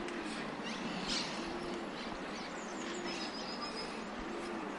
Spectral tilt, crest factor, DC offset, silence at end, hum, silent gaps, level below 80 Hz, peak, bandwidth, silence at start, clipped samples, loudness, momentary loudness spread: -3.5 dB/octave; 16 dB; under 0.1%; 0 s; none; none; -62 dBFS; -24 dBFS; 11.5 kHz; 0 s; under 0.1%; -40 LUFS; 6 LU